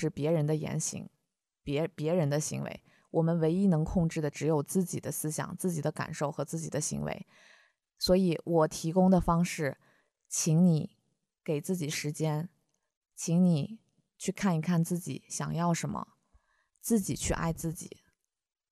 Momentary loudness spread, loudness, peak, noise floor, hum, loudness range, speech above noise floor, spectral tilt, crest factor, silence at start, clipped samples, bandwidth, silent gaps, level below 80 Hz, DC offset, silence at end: 14 LU; -31 LUFS; -12 dBFS; -78 dBFS; none; 5 LU; 49 dB; -6 dB/octave; 18 dB; 0 s; under 0.1%; 14.5 kHz; 12.97-13.01 s; -52 dBFS; under 0.1%; 0.85 s